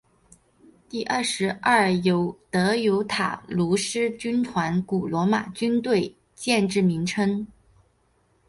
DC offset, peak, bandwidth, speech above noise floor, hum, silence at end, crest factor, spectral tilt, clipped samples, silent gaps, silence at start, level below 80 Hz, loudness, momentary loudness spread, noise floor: under 0.1%; -6 dBFS; 11.5 kHz; 42 dB; none; 1 s; 18 dB; -5 dB/octave; under 0.1%; none; 0.95 s; -58 dBFS; -24 LUFS; 6 LU; -65 dBFS